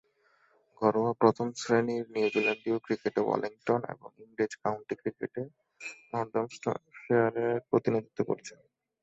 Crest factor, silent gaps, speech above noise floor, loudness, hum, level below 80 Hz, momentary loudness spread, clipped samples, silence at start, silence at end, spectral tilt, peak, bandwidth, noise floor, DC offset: 22 dB; none; 38 dB; -31 LUFS; none; -72 dBFS; 14 LU; under 0.1%; 0.8 s; 0.5 s; -6 dB/octave; -8 dBFS; 8 kHz; -68 dBFS; under 0.1%